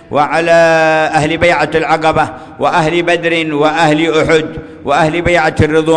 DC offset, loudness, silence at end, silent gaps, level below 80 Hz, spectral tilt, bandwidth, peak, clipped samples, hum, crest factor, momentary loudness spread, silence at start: under 0.1%; -11 LUFS; 0 s; none; -36 dBFS; -5.5 dB/octave; 10.5 kHz; 0 dBFS; under 0.1%; none; 10 dB; 6 LU; 0.1 s